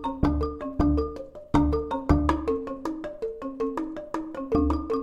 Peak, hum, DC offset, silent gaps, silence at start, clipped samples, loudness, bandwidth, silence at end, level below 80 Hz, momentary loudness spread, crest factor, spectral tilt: -6 dBFS; none; 0.1%; none; 0 s; under 0.1%; -27 LUFS; 9 kHz; 0 s; -34 dBFS; 10 LU; 20 dB; -8.5 dB/octave